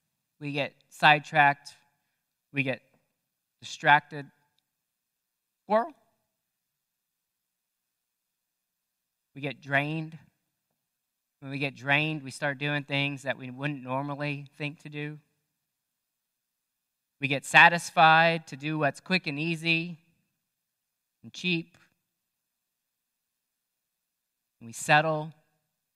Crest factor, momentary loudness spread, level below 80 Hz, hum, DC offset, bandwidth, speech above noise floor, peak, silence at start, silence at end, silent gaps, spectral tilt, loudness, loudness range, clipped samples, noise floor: 28 dB; 18 LU; -80 dBFS; none; under 0.1%; 15 kHz; 57 dB; -2 dBFS; 0.4 s; 0.65 s; none; -4.5 dB/octave; -26 LUFS; 15 LU; under 0.1%; -84 dBFS